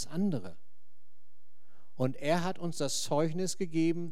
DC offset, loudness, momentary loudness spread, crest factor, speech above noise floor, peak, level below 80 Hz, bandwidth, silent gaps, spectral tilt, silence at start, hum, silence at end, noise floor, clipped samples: 2%; -33 LUFS; 5 LU; 20 dB; 46 dB; -16 dBFS; -76 dBFS; 16 kHz; none; -5 dB/octave; 0 s; none; 0 s; -78 dBFS; under 0.1%